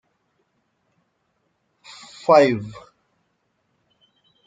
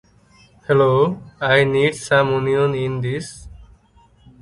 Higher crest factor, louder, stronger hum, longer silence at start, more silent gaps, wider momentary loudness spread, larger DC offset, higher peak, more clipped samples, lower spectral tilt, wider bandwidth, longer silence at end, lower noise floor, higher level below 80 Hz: first, 24 dB vs 18 dB; about the same, -18 LUFS vs -18 LUFS; neither; first, 2.3 s vs 0.7 s; neither; first, 27 LU vs 13 LU; neither; about the same, -2 dBFS vs -2 dBFS; neither; about the same, -6 dB/octave vs -6 dB/octave; second, 9.2 kHz vs 11.5 kHz; first, 1.75 s vs 0.8 s; first, -71 dBFS vs -53 dBFS; second, -68 dBFS vs -48 dBFS